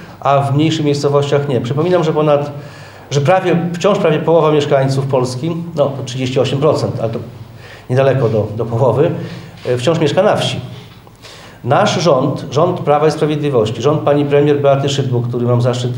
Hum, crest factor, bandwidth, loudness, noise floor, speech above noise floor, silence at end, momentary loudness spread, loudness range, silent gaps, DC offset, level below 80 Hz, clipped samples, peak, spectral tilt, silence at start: none; 14 dB; 16.5 kHz; -14 LUFS; -37 dBFS; 24 dB; 0 s; 13 LU; 3 LU; none; under 0.1%; -52 dBFS; under 0.1%; 0 dBFS; -6.5 dB/octave; 0 s